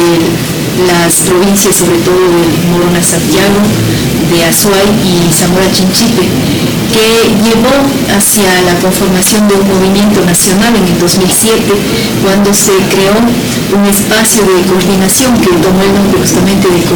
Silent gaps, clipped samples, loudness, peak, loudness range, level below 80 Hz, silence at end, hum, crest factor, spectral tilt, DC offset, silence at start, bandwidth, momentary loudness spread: none; under 0.1%; -7 LUFS; 0 dBFS; 1 LU; -30 dBFS; 0 s; none; 8 dB; -4 dB/octave; under 0.1%; 0 s; over 20 kHz; 3 LU